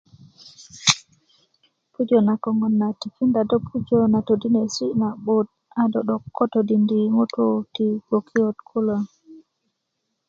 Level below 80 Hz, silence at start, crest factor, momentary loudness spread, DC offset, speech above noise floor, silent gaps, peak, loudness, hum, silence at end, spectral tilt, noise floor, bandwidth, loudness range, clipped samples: -60 dBFS; 0.6 s; 22 dB; 6 LU; under 0.1%; 56 dB; none; 0 dBFS; -21 LUFS; none; 0.9 s; -5 dB/octave; -77 dBFS; 8 kHz; 2 LU; under 0.1%